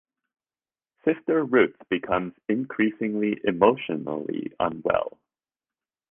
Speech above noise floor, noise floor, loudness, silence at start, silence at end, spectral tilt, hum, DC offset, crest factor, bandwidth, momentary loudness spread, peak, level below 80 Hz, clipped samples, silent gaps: over 66 dB; under -90 dBFS; -25 LUFS; 1.05 s; 1 s; -9.5 dB/octave; none; under 0.1%; 22 dB; 3.7 kHz; 9 LU; -4 dBFS; -60 dBFS; under 0.1%; none